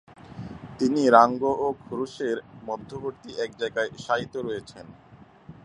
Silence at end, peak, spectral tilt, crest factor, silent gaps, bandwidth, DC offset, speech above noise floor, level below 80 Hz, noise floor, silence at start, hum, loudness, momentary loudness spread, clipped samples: 0.15 s; -2 dBFS; -5.5 dB/octave; 26 dB; none; 10.5 kHz; under 0.1%; 23 dB; -60 dBFS; -48 dBFS; 0.25 s; none; -25 LUFS; 23 LU; under 0.1%